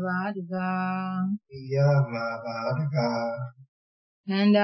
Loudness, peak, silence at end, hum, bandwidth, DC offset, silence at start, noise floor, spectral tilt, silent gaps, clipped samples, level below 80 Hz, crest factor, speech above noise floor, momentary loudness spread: -27 LUFS; -8 dBFS; 0 s; none; 6 kHz; under 0.1%; 0 s; under -90 dBFS; -8 dB/octave; 3.68-4.24 s; under 0.1%; -70 dBFS; 18 dB; over 64 dB; 10 LU